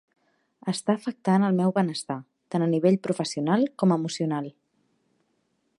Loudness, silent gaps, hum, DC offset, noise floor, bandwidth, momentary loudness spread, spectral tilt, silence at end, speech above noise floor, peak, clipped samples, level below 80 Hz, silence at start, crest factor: -25 LUFS; none; none; under 0.1%; -72 dBFS; 11.5 kHz; 10 LU; -6.5 dB/octave; 1.3 s; 48 dB; -8 dBFS; under 0.1%; -76 dBFS; 0.65 s; 18 dB